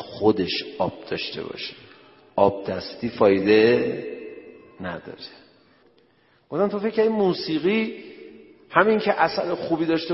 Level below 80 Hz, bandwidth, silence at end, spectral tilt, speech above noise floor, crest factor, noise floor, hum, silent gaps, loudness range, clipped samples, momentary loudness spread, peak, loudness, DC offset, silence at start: -60 dBFS; 5.8 kHz; 0 s; -9 dB/octave; 38 dB; 22 dB; -60 dBFS; none; none; 5 LU; under 0.1%; 19 LU; 0 dBFS; -23 LUFS; under 0.1%; 0 s